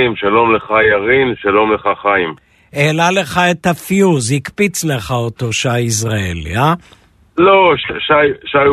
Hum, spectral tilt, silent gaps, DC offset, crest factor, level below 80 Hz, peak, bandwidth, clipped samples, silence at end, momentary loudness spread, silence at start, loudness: none; -4.5 dB/octave; none; under 0.1%; 14 dB; -42 dBFS; 0 dBFS; 13.5 kHz; under 0.1%; 0 s; 7 LU; 0 s; -13 LUFS